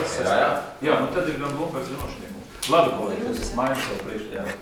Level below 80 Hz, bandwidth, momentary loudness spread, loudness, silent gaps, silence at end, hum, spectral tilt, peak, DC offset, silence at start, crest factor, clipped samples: -44 dBFS; over 20 kHz; 12 LU; -25 LUFS; none; 0 s; none; -4.5 dB/octave; -6 dBFS; under 0.1%; 0 s; 20 dB; under 0.1%